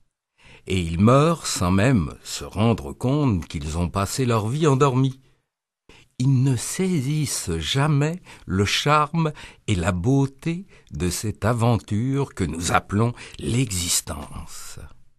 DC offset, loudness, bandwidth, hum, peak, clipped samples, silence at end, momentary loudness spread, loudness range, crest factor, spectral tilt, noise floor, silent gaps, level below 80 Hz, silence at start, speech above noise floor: under 0.1%; -22 LUFS; 13 kHz; none; -2 dBFS; under 0.1%; 0.15 s; 11 LU; 3 LU; 20 dB; -5.5 dB/octave; -79 dBFS; none; -42 dBFS; 0.65 s; 57 dB